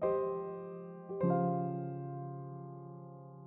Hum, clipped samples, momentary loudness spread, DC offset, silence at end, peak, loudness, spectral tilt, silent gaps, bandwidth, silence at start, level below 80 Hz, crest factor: none; under 0.1%; 17 LU; under 0.1%; 0 s; -20 dBFS; -38 LUFS; -11 dB/octave; none; 2.8 kHz; 0 s; -76 dBFS; 18 dB